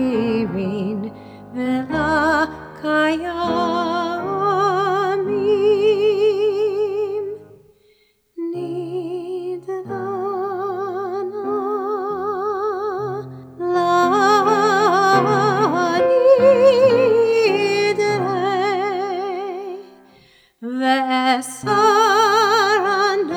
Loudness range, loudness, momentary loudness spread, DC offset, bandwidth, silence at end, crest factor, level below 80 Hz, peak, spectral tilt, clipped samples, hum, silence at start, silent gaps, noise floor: 11 LU; -18 LUFS; 13 LU; under 0.1%; 16.5 kHz; 0 s; 16 dB; -54 dBFS; -2 dBFS; -5 dB/octave; under 0.1%; none; 0 s; none; -59 dBFS